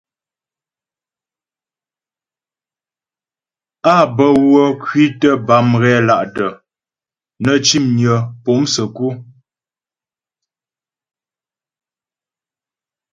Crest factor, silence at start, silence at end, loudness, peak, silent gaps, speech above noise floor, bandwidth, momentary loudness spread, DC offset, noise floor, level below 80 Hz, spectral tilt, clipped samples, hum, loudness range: 18 dB; 3.85 s; 3.9 s; -13 LUFS; 0 dBFS; none; over 77 dB; 9 kHz; 9 LU; under 0.1%; under -90 dBFS; -56 dBFS; -5 dB/octave; under 0.1%; none; 10 LU